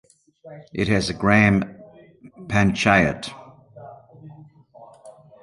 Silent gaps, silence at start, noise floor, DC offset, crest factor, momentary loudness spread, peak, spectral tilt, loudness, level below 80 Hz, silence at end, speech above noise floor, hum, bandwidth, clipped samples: none; 0.45 s; -48 dBFS; under 0.1%; 22 dB; 18 LU; -2 dBFS; -6 dB/octave; -19 LUFS; -46 dBFS; 0.3 s; 28 dB; none; 11.5 kHz; under 0.1%